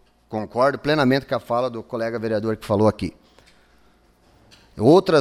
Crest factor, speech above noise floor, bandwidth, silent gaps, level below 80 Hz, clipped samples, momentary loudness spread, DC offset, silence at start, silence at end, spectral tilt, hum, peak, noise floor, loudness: 18 dB; 37 dB; 14.5 kHz; none; -52 dBFS; under 0.1%; 14 LU; under 0.1%; 0.3 s; 0 s; -7 dB/octave; none; -4 dBFS; -57 dBFS; -21 LUFS